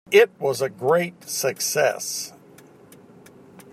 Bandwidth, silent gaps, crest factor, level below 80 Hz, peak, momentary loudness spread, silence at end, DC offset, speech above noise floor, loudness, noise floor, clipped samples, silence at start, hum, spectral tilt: 16 kHz; none; 20 dB; -72 dBFS; -4 dBFS; 11 LU; 1.45 s; under 0.1%; 28 dB; -22 LUFS; -49 dBFS; under 0.1%; 0.1 s; none; -2.5 dB/octave